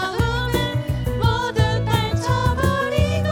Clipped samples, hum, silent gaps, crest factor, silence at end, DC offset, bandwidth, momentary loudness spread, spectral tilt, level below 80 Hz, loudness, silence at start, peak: under 0.1%; none; none; 14 dB; 0 s; under 0.1%; 18 kHz; 3 LU; -6 dB/octave; -32 dBFS; -21 LUFS; 0 s; -6 dBFS